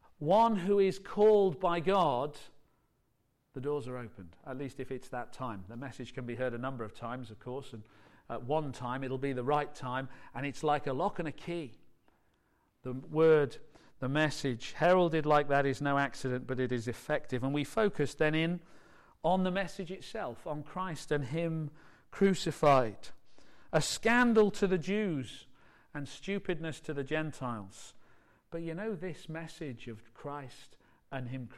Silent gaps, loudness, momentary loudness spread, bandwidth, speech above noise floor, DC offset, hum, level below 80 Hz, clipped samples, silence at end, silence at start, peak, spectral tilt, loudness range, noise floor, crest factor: none; -33 LUFS; 17 LU; 13.5 kHz; 44 dB; under 0.1%; none; -58 dBFS; under 0.1%; 0 s; 0.2 s; -16 dBFS; -6 dB/octave; 11 LU; -76 dBFS; 18 dB